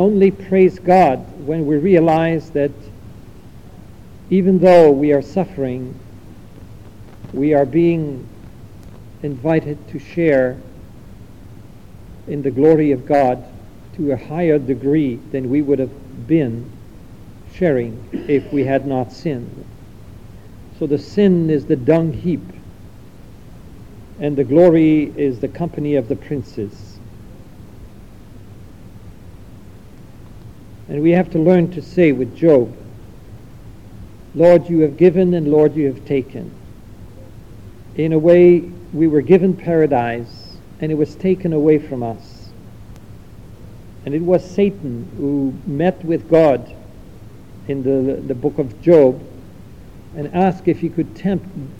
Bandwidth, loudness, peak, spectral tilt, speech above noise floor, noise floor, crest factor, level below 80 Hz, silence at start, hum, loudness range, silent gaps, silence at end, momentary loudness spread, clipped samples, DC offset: 9 kHz; -16 LUFS; 0 dBFS; -9 dB/octave; 24 dB; -40 dBFS; 18 dB; -44 dBFS; 0 s; none; 6 LU; none; 0.05 s; 17 LU; under 0.1%; 0.7%